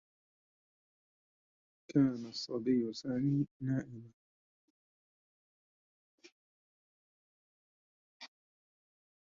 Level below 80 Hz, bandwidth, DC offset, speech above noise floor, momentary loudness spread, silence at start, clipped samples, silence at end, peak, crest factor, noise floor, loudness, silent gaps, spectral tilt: -74 dBFS; 7.4 kHz; under 0.1%; over 56 dB; 23 LU; 1.9 s; under 0.1%; 0.95 s; -18 dBFS; 22 dB; under -90 dBFS; -35 LUFS; 3.51-3.60 s, 4.13-6.18 s, 6.32-8.20 s; -7.5 dB/octave